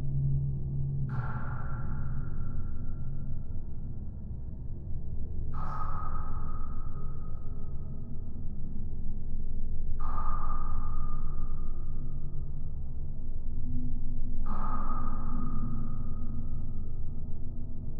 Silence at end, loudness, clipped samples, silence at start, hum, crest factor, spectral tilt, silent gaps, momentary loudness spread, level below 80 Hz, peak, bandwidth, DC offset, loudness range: 0 s; -38 LUFS; under 0.1%; 0 s; none; 12 dB; -11.5 dB/octave; none; 8 LU; -30 dBFS; -14 dBFS; 1.8 kHz; under 0.1%; 3 LU